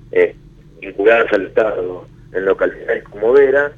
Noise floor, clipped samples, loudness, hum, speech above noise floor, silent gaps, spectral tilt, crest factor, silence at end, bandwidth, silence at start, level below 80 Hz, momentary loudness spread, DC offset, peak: -42 dBFS; under 0.1%; -15 LUFS; none; 27 dB; none; -6.5 dB/octave; 16 dB; 0.05 s; 6.6 kHz; 0.15 s; -46 dBFS; 15 LU; under 0.1%; 0 dBFS